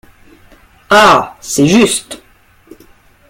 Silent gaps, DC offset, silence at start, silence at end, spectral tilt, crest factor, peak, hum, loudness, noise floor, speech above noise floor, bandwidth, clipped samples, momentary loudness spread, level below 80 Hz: none; under 0.1%; 0.9 s; 1.15 s; -3.5 dB/octave; 14 dB; 0 dBFS; none; -10 LUFS; -47 dBFS; 37 dB; 17 kHz; under 0.1%; 18 LU; -44 dBFS